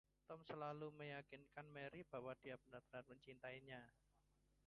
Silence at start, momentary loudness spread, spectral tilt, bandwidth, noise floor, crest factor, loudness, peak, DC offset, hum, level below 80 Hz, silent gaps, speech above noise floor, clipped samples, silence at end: 0.3 s; 8 LU; -7 dB/octave; 10.5 kHz; -81 dBFS; 18 dB; -56 LUFS; -38 dBFS; under 0.1%; 50 Hz at -75 dBFS; -82 dBFS; none; 25 dB; under 0.1%; 0.5 s